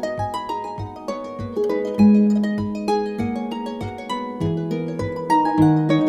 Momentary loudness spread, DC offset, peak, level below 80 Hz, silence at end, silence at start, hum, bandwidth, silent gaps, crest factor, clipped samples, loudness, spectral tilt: 14 LU; under 0.1%; -4 dBFS; -48 dBFS; 0 s; 0 s; none; 11 kHz; none; 16 dB; under 0.1%; -21 LUFS; -8 dB/octave